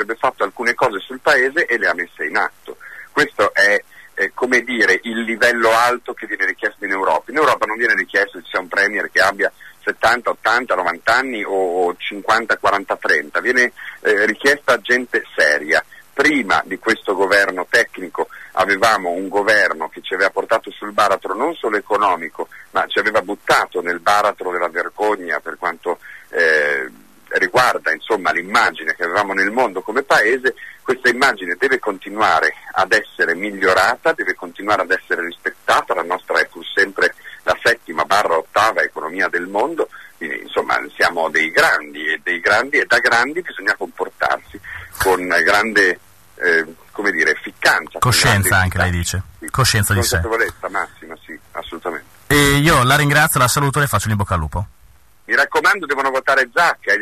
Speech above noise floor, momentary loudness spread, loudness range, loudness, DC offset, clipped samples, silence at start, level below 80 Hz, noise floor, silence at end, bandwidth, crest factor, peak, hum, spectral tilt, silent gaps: 33 dB; 10 LU; 3 LU; -17 LUFS; 0.3%; under 0.1%; 0 s; -44 dBFS; -51 dBFS; 0 s; 13.5 kHz; 14 dB; -2 dBFS; none; -3.5 dB/octave; none